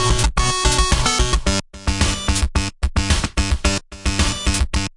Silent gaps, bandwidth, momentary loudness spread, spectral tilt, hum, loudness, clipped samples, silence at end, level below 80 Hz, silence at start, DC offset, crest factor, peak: none; 11.5 kHz; 6 LU; -3.5 dB/octave; none; -19 LUFS; under 0.1%; 0.05 s; -22 dBFS; 0 s; under 0.1%; 16 dB; -2 dBFS